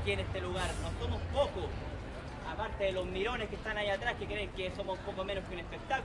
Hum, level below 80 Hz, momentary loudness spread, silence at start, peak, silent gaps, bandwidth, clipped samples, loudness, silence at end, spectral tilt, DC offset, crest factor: none; -46 dBFS; 9 LU; 0 s; -18 dBFS; none; 11.5 kHz; under 0.1%; -37 LUFS; 0 s; -5 dB/octave; under 0.1%; 18 dB